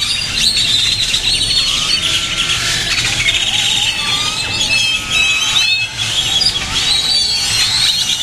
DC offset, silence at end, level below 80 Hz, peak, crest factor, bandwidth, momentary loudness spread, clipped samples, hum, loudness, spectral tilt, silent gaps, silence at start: under 0.1%; 0 s; -34 dBFS; 0 dBFS; 14 dB; 16 kHz; 3 LU; under 0.1%; none; -12 LUFS; 0 dB/octave; none; 0 s